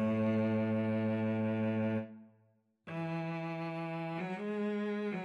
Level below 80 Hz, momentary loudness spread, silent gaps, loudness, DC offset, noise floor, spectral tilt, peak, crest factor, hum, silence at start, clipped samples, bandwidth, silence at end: -80 dBFS; 8 LU; none; -35 LUFS; under 0.1%; -72 dBFS; -9 dB/octave; -22 dBFS; 12 dB; none; 0 s; under 0.1%; 6 kHz; 0 s